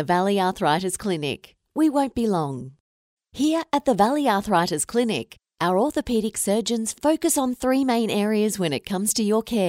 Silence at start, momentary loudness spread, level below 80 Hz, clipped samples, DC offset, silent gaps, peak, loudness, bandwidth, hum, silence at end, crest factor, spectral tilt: 0 s; 7 LU; -54 dBFS; under 0.1%; under 0.1%; 2.80-3.17 s; -6 dBFS; -23 LUFS; 16 kHz; none; 0 s; 16 dB; -4.5 dB/octave